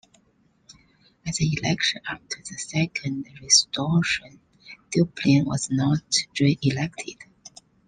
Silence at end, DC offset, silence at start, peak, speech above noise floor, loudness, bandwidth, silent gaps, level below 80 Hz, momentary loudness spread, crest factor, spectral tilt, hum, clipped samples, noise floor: 0.4 s; under 0.1%; 0.7 s; -4 dBFS; 40 dB; -23 LUFS; 11 kHz; none; -56 dBFS; 16 LU; 22 dB; -3.5 dB/octave; none; under 0.1%; -64 dBFS